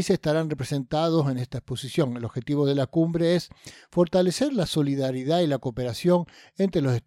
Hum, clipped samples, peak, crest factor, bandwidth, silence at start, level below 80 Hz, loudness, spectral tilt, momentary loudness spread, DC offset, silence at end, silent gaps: none; under 0.1%; -10 dBFS; 16 dB; 15 kHz; 0 s; -54 dBFS; -25 LUFS; -6.5 dB/octave; 7 LU; under 0.1%; 0.05 s; none